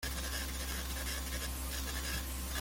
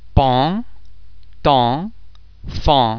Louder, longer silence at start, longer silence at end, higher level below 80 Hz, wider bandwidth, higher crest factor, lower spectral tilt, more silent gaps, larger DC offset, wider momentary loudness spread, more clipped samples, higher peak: second, -38 LUFS vs -17 LUFS; about the same, 0 s vs 0.05 s; about the same, 0 s vs 0 s; second, -42 dBFS vs -30 dBFS; first, 17 kHz vs 5.4 kHz; about the same, 14 dB vs 18 dB; second, -2.5 dB/octave vs -7.5 dB/octave; neither; neither; second, 1 LU vs 17 LU; neither; second, -24 dBFS vs 0 dBFS